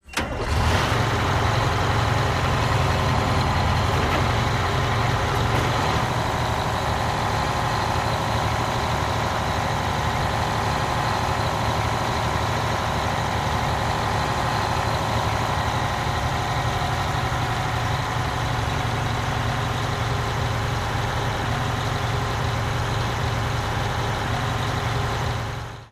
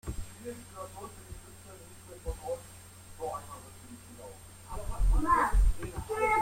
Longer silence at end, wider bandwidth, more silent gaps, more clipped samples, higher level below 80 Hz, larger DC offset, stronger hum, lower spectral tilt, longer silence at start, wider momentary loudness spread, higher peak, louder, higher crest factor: about the same, 0.05 s vs 0 s; about the same, 15.5 kHz vs 16 kHz; neither; neither; about the same, -34 dBFS vs -36 dBFS; neither; neither; about the same, -5 dB/octave vs -5.5 dB/octave; about the same, 0.05 s vs 0.05 s; second, 3 LU vs 22 LU; first, -6 dBFS vs -14 dBFS; first, -23 LUFS vs -34 LUFS; about the same, 16 dB vs 18 dB